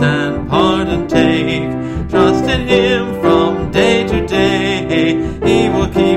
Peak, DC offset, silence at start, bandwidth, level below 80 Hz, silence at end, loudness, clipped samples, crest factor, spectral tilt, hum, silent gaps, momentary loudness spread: 0 dBFS; under 0.1%; 0 s; 13 kHz; -30 dBFS; 0 s; -14 LUFS; under 0.1%; 12 dB; -6 dB/octave; none; none; 4 LU